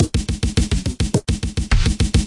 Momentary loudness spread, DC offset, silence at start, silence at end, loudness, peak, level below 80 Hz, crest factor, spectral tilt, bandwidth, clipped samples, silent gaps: 4 LU; under 0.1%; 0 s; 0 s; -21 LUFS; -4 dBFS; -22 dBFS; 14 dB; -5 dB/octave; 11.5 kHz; under 0.1%; none